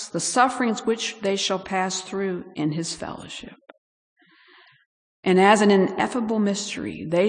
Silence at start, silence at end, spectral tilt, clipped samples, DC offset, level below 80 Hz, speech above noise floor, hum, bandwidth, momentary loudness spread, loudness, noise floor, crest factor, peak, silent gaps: 0 s; 0 s; -4 dB/octave; under 0.1%; under 0.1%; -64 dBFS; 32 dB; none; 10.5 kHz; 14 LU; -22 LUFS; -54 dBFS; 20 dB; -4 dBFS; 3.78-4.16 s, 4.86-5.23 s